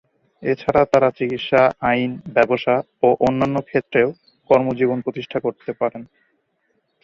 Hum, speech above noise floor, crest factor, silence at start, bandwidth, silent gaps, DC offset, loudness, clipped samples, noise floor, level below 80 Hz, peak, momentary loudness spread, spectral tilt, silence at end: none; 49 dB; 18 dB; 0.4 s; 7.6 kHz; none; under 0.1%; -19 LUFS; under 0.1%; -68 dBFS; -54 dBFS; -2 dBFS; 9 LU; -7 dB/octave; 1 s